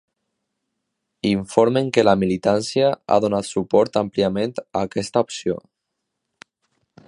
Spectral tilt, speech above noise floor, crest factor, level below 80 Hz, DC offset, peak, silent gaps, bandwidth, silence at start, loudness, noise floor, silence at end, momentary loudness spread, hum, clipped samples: -5.5 dB/octave; 60 dB; 20 dB; -54 dBFS; under 0.1%; 0 dBFS; none; 11 kHz; 1.25 s; -20 LUFS; -79 dBFS; 1.5 s; 8 LU; none; under 0.1%